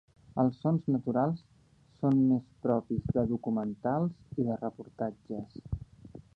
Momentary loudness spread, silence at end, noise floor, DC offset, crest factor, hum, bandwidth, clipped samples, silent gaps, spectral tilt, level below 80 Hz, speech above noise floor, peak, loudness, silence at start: 13 LU; 0.15 s; -63 dBFS; under 0.1%; 18 dB; none; 5 kHz; under 0.1%; none; -11 dB/octave; -54 dBFS; 32 dB; -14 dBFS; -32 LUFS; 0.35 s